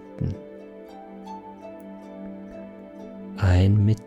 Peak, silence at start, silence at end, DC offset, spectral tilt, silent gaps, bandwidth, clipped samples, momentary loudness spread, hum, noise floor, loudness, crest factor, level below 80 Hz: -10 dBFS; 0 s; 0.05 s; under 0.1%; -8.5 dB/octave; none; 8 kHz; under 0.1%; 22 LU; none; -42 dBFS; -22 LUFS; 16 dB; -50 dBFS